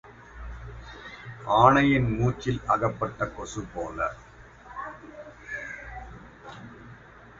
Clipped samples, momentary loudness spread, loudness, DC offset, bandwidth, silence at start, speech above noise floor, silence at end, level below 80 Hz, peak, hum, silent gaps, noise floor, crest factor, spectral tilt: under 0.1%; 25 LU; -25 LUFS; under 0.1%; 7.8 kHz; 0.05 s; 24 dB; 0 s; -46 dBFS; -4 dBFS; none; none; -49 dBFS; 24 dB; -6.5 dB/octave